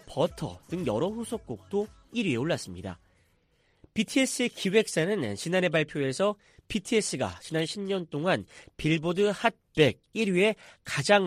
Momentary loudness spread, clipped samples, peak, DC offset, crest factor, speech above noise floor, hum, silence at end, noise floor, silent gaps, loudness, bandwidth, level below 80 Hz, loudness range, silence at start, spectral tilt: 11 LU; under 0.1%; -8 dBFS; under 0.1%; 20 dB; 40 dB; none; 0 s; -68 dBFS; none; -28 LUFS; 15 kHz; -58 dBFS; 5 LU; 0.1 s; -4.5 dB/octave